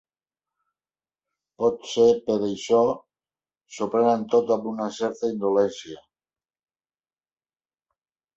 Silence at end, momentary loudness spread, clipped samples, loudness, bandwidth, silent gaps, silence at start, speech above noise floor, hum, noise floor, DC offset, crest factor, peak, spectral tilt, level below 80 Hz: 2.4 s; 14 LU; under 0.1%; -23 LUFS; 8 kHz; none; 1.6 s; over 67 dB; none; under -90 dBFS; under 0.1%; 18 dB; -8 dBFS; -5.5 dB/octave; -66 dBFS